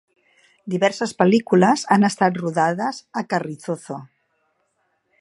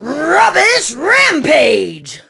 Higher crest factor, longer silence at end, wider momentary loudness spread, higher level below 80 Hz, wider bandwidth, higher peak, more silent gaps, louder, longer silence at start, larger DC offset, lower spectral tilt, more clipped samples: first, 20 dB vs 12 dB; first, 1.15 s vs 0.1 s; first, 13 LU vs 6 LU; second, -68 dBFS vs -52 dBFS; about the same, 11.5 kHz vs 12 kHz; about the same, 0 dBFS vs 0 dBFS; neither; second, -20 LUFS vs -10 LUFS; first, 0.65 s vs 0 s; neither; first, -5.5 dB/octave vs -2 dB/octave; neither